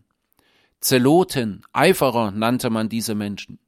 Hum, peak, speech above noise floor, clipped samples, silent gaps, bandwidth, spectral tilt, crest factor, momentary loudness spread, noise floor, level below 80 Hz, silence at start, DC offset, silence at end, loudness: none; -2 dBFS; 45 dB; under 0.1%; none; 16.5 kHz; -5 dB/octave; 18 dB; 9 LU; -64 dBFS; -56 dBFS; 0.8 s; under 0.1%; 0.15 s; -20 LUFS